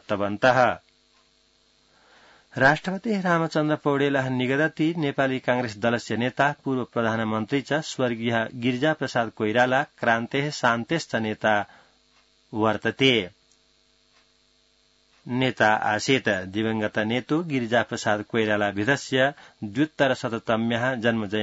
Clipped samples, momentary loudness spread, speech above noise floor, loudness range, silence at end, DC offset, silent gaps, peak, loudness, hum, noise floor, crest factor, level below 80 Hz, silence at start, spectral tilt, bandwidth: under 0.1%; 6 LU; 40 dB; 3 LU; 0 s; under 0.1%; none; -6 dBFS; -24 LUFS; none; -63 dBFS; 20 dB; -64 dBFS; 0.1 s; -5.5 dB/octave; 8 kHz